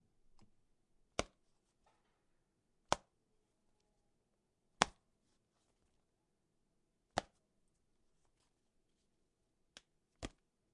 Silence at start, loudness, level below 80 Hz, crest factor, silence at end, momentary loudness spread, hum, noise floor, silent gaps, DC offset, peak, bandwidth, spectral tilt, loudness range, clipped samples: 1.2 s; -43 LUFS; -68 dBFS; 44 dB; 0.45 s; 25 LU; none; -83 dBFS; none; under 0.1%; -6 dBFS; 10.5 kHz; -2.5 dB/octave; 8 LU; under 0.1%